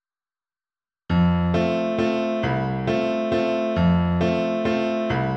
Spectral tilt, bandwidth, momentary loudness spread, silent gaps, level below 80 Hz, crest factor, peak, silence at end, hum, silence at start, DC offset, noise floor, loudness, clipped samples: -8 dB/octave; 6.6 kHz; 4 LU; none; -42 dBFS; 14 dB; -8 dBFS; 0 s; none; 1.1 s; under 0.1%; under -90 dBFS; -22 LUFS; under 0.1%